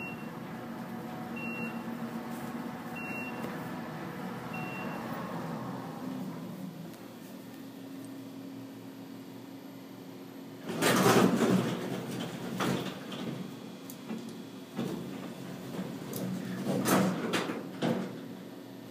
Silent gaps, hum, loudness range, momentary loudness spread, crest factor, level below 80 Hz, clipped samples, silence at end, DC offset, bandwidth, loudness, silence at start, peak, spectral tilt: none; none; 14 LU; 18 LU; 24 dB; -72 dBFS; under 0.1%; 0 s; under 0.1%; 15.5 kHz; -35 LUFS; 0 s; -12 dBFS; -5 dB/octave